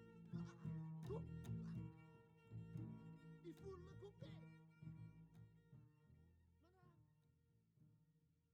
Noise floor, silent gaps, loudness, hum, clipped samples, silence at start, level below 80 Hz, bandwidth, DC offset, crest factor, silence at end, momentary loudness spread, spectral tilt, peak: -80 dBFS; none; -56 LUFS; none; under 0.1%; 0 s; -74 dBFS; 9.4 kHz; under 0.1%; 18 dB; 0.25 s; 16 LU; -8.5 dB/octave; -40 dBFS